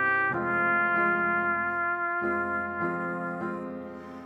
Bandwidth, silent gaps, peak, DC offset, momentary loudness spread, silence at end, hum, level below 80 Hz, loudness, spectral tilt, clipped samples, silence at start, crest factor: 7.8 kHz; none; -14 dBFS; under 0.1%; 11 LU; 0 s; none; -64 dBFS; -27 LUFS; -8 dB/octave; under 0.1%; 0 s; 14 dB